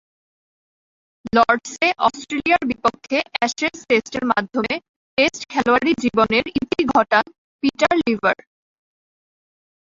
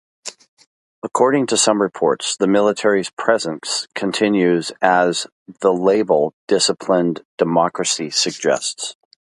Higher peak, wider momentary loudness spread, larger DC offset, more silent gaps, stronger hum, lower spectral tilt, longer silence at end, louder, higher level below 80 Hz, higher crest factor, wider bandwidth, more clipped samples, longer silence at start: about the same, -2 dBFS vs 0 dBFS; about the same, 7 LU vs 9 LU; neither; second, 4.89-5.17 s, 7.38-7.59 s vs 0.48-0.57 s, 0.67-1.02 s, 3.13-3.17 s, 5.32-5.46 s, 6.33-6.47 s, 7.25-7.38 s; neither; about the same, -4 dB/octave vs -3.5 dB/octave; first, 1.5 s vs 0.45 s; about the same, -19 LUFS vs -18 LUFS; first, -54 dBFS vs -64 dBFS; about the same, 18 dB vs 18 dB; second, 7.8 kHz vs 11.5 kHz; neither; first, 1.25 s vs 0.25 s